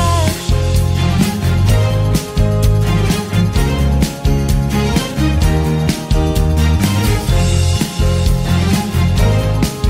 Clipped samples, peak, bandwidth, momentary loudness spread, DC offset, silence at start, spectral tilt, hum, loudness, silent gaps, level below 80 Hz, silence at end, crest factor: under 0.1%; -2 dBFS; 16.5 kHz; 2 LU; under 0.1%; 0 s; -6 dB/octave; none; -15 LUFS; none; -18 dBFS; 0 s; 10 dB